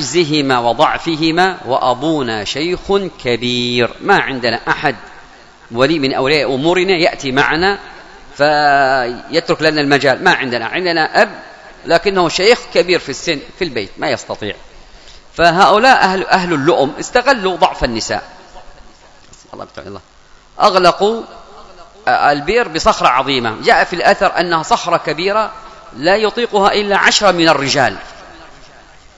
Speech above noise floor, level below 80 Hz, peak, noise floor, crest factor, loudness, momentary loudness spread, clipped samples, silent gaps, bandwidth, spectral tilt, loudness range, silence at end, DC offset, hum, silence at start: 28 dB; -40 dBFS; 0 dBFS; -42 dBFS; 14 dB; -13 LUFS; 11 LU; 0.2%; none; 11 kHz; -4 dB/octave; 4 LU; 0.5 s; under 0.1%; none; 0 s